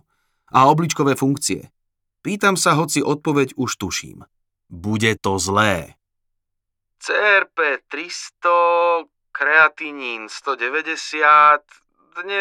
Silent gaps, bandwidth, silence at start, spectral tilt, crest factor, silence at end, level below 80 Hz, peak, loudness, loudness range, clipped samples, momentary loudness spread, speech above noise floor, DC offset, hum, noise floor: none; 19.5 kHz; 0.55 s; -4 dB/octave; 18 dB; 0 s; -60 dBFS; -2 dBFS; -18 LUFS; 5 LU; under 0.1%; 14 LU; 59 dB; under 0.1%; none; -78 dBFS